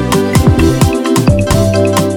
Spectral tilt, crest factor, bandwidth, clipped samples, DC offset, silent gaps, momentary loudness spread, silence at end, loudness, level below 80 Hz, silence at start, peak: -6 dB/octave; 10 dB; 18 kHz; under 0.1%; under 0.1%; none; 2 LU; 0 s; -10 LUFS; -22 dBFS; 0 s; 0 dBFS